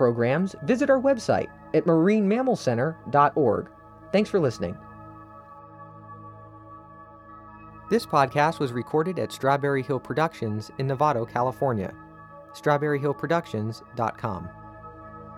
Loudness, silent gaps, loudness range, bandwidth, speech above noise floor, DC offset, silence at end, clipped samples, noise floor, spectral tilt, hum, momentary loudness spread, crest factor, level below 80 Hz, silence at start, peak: -25 LUFS; none; 8 LU; 16 kHz; 23 dB; under 0.1%; 0 s; under 0.1%; -47 dBFS; -7 dB/octave; none; 24 LU; 20 dB; -58 dBFS; 0 s; -6 dBFS